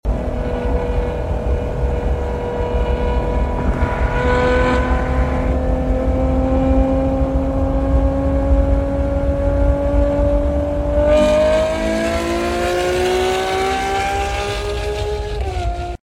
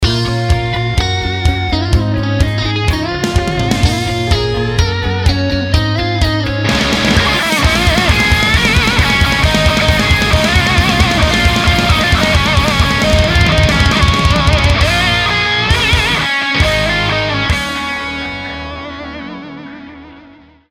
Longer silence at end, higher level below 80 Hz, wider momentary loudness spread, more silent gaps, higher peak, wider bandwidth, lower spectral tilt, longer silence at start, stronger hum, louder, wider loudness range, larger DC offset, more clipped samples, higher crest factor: second, 0.1 s vs 0.5 s; about the same, -20 dBFS vs -20 dBFS; about the same, 7 LU vs 8 LU; neither; second, -4 dBFS vs 0 dBFS; second, 13 kHz vs 16.5 kHz; first, -6.5 dB/octave vs -4.5 dB/octave; about the same, 0.05 s vs 0 s; neither; second, -18 LUFS vs -12 LUFS; about the same, 3 LU vs 4 LU; neither; neither; about the same, 14 dB vs 12 dB